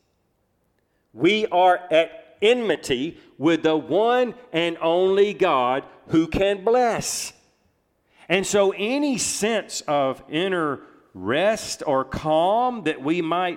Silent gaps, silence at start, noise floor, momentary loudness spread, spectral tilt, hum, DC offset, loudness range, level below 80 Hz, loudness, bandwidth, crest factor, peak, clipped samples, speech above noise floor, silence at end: none; 1.15 s; -69 dBFS; 7 LU; -4 dB/octave; none; under 0.1%; 3 LU; -52 dBFS; -22 LUFS; 16.5 kHz; 18 dB; -4 dBFS; under 0.1%; 47 dB; 0 s